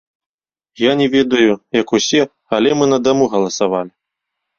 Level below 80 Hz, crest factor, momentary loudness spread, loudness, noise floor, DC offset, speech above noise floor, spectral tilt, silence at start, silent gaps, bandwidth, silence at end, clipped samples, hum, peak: -54 dBFS; 16 dB; 5 LU; -15 LUFS; -78 dBFS; under 0.1%; 64 dB; -4 dB/octave; 0.8 s; none; 7.4 kHz; 0.7 s; under 0.1%; none; 0 dBFS